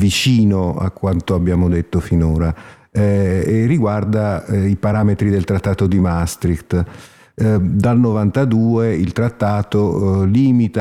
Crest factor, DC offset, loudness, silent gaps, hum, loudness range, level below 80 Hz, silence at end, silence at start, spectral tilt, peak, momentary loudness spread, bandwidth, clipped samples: 12 dB; under 0.1%; -16 LUFS; none; none; 2 LU; -34 dBFS; 0 s; 0 s; -7 dB/octave; -4 dBFS; 6 LU; 14 kHz; under 0.1%